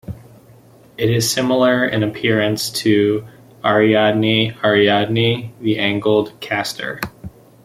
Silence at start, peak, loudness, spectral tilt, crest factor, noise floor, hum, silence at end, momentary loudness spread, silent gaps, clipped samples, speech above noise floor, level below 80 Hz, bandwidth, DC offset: 0.1 s; -2 dBFS; -17 LUFS; -5 dB/octave; 16 dB; -46 dBFS; none; 0.35 s; 10 LU; none; under 0.1%; 30 dB; -52 dBFS; 16 kHz; under 0.1%